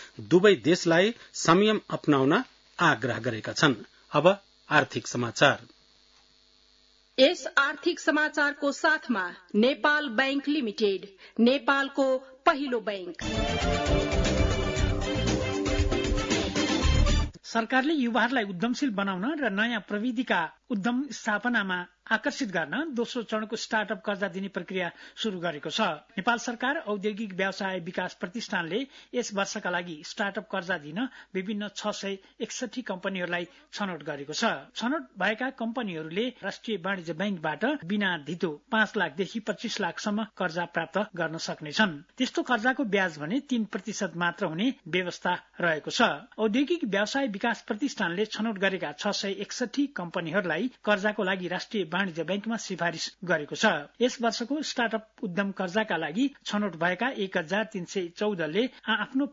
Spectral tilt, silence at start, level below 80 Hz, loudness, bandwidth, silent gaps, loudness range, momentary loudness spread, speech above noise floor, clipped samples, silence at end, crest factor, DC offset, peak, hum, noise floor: -4.5 dB/octave; 0 s; -42 dBFS; -28 LUFS; 7.8 kHz; none; 6 LU; 9 LU; 34 dB; under 0.1%; 0 s; 22 dB; under 0.1%; -6 dBFS; none; -62 dBFS